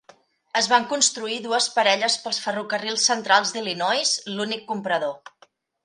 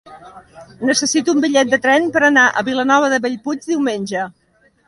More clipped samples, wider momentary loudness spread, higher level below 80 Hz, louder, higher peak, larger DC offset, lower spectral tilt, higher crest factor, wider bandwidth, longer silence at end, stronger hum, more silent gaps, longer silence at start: neither; about the same, 9 LU vs 11 LU; second, -74 dBFS vs -60 dBFS; second, -22 LUFS vs -15 LUFS; about the same, -2 dBFS vs 0 dBFS; neither; second, -1 dB/octave vs -2.5 dB/octave; first, 22 dB vs 16 dB; about the same, 11.5 kHz vs 11.5 kHz; about the same, 0.7 s vs 0.6 s; neither; neither; first, 0.55 s vs 0.05 s